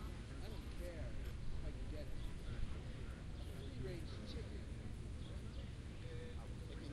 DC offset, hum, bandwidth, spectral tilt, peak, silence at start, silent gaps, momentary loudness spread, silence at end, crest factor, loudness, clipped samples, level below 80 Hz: under 0.1%; none; 13.5 kHz; -6.5 dB/octave; -30 dBFS; 0 s; none; 2 LU; 0 s; 16 dB; -50 LUFS; under 0.1%; -50 dBFS